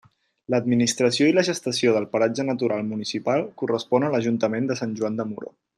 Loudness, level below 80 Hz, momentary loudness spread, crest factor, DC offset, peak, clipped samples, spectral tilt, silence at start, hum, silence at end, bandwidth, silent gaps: -23 LUFS; -66 dBFS; 8 LU; 16 dB; under 0.1%; -6 dBFS; under 0.1%; -5 dB/octave; 0.5 s; none; 0.35 s; 12.5 kHz; none